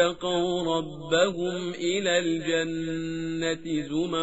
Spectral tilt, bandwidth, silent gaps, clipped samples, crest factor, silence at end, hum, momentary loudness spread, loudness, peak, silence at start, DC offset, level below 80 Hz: -3.5 dB/octave; 8 kHz; none; under 0.1%; 18 dB; 0 s; none; 6 LU; -27 LUFS; -8 dBFS; 0 s; 0.3%; -58 dBFS